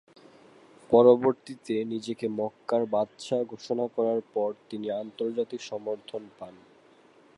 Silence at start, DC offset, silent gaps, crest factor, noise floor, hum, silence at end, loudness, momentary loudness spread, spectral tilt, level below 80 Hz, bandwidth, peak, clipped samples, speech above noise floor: 0.9 s; under 0.1%; none; 22 dB; -58 dBFS; none; 0.85 s; -28 LUFS; 17 LU; -6.5 dB/octave; -72 dBFS; 11 kHz; -6 dBFS; under 0.1%; 31 dB